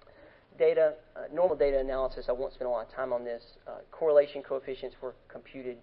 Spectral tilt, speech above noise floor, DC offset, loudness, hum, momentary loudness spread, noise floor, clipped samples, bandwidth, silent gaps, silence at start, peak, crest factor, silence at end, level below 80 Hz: -9 dB/octave; 26 dB; under 0.1%; -30 LUFS; none; 18 LU; -56 dBFS; under 0.1%; 5.4 kHz; none; 0.6 s; -12 dBFS; 20 dB; 0.05 s; -50 dBFS